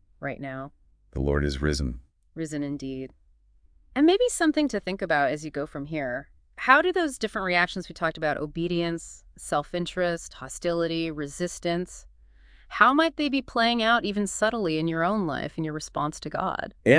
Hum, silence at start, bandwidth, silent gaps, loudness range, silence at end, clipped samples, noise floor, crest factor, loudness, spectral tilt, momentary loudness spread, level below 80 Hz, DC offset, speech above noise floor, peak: none; 0.2 s; 10.5 kHz; none; 6 LU; 0 s; under 0.1%; -59 dBFS; 24 dB; -26 LUFS; -4.5 dB/octave; 15 LU; -44 dBFS; under 0.1%; 33 dB; -2 dBFS